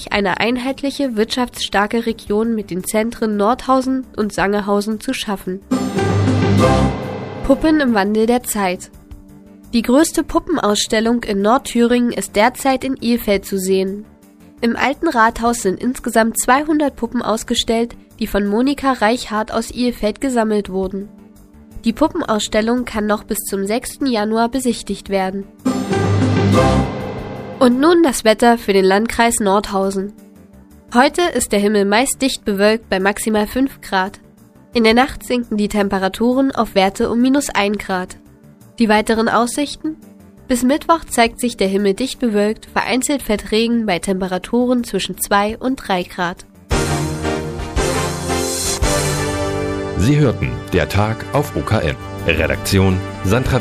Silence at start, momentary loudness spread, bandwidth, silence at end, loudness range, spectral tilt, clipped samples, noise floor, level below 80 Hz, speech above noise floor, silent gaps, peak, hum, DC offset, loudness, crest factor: 0 s; 8 LU; 15.5 kHz; 0 s; 4 LU; -5 dB/octave; under 0.1%; -45 dBFS; -36 dBFS; 29 dB; none; 0 dBFS; none; under 0.1%; -17 LUFS; 16 dB